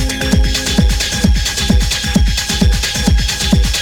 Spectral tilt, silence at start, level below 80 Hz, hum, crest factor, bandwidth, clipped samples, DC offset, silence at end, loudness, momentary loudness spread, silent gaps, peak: -4 dB/octave; 0 s; -16 dBFS; none; 12 dB; 18 kHz; under 0.1%; under 0.1%; 0 s; -14 LUFS; 1 LU; none; 0 dBFS